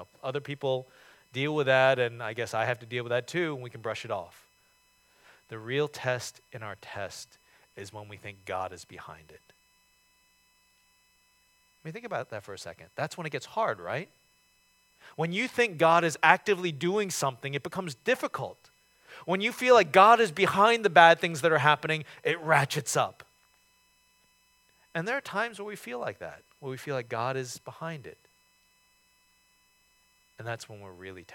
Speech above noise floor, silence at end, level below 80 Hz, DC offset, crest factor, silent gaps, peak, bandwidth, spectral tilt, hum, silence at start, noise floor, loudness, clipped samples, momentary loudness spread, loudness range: 39 dB; 0 s; -74 dBFS; under 0.1%; 28 dB; none; -2 dBFS; 17.5 kHz; -4 dB/octave; none; 0 s; -67 dBFS; -27 LUFS; under 0.1%; 22 LU; 21 LU